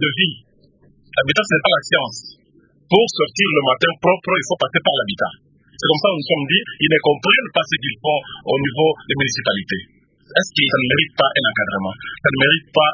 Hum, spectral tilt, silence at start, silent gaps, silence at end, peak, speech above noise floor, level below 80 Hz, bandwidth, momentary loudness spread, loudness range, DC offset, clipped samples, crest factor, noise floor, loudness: none; -4 dB/octave; 0 s; none; 0 s; 0 dBFS; 37 dB; -54 dBFS; 7.6 kHz; 8 LU; 2 LU; under 0.1%; under 0.1%; 18 dB; -54 dBFS; -17 LUFS